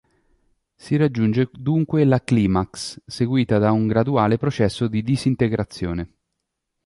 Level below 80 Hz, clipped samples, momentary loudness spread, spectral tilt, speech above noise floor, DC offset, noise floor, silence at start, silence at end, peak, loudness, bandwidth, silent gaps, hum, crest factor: -44 dBFS; under 0.1%; 9 LU; -7.5 dB/octave; 59 dB; under 0.1%; -78 dBFS; 0.85 s; 0.8 s; -4 dBFS; -21 LUFS; 11.5 kHz; none; none; 16 dB